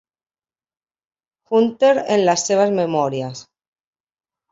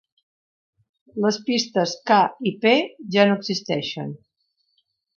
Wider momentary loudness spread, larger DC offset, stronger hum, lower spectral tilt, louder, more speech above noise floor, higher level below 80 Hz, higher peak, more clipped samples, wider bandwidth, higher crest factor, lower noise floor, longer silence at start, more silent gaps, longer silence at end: about the same, 12 LU vs 13 LU; neither; neither; about the same, -4.5 dB/octave vs -4.5 dB/octave; first, -17 LUFS vs -21 LUFS; first, over 73 dB vs 51 dB; about the same, -66 dBFS vs -70 dBFS; about the same, -4 dBFS vs -4 dBFS; neither; first, 8 kHz vs 7.2 kHz; about the same, 16 dB vs 20 dB; first, under -90 dBFS vs -72 dBFS; first, 1.5 s vs 1.15 s; neither; about the same, 1.1 s vs 1 s